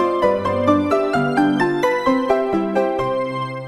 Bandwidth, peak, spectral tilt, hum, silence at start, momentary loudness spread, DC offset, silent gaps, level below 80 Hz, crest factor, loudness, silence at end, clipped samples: 12.5 kHz; -2 dBFS; -6.5 dB/octave; none; 0 s; 4 LU; under 0.1%; none; -50 dBFS; 16 dB; -18 LUFS; 0 s; under 0.1%